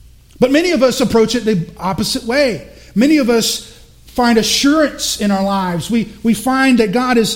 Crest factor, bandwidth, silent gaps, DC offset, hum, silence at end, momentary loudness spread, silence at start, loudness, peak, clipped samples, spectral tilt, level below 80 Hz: 14 dB; 16.5 kHz; none; under 0.1%; none; 0 s; 7 LU; 0.4 s; -14 LUFS; 0 dBFS; under 0.1%; -4 dB/octave; -40 dBFS